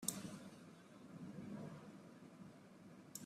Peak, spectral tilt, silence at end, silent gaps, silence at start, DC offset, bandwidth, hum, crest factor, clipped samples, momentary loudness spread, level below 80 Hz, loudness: -22 dBFS; -3.5 dB/octave; 0 s; none; 0 s; under 0.1%; 15.5 kHz; none; 32 dB; under 0.1%; 10 LU; -84 dBFS; -55 LUFS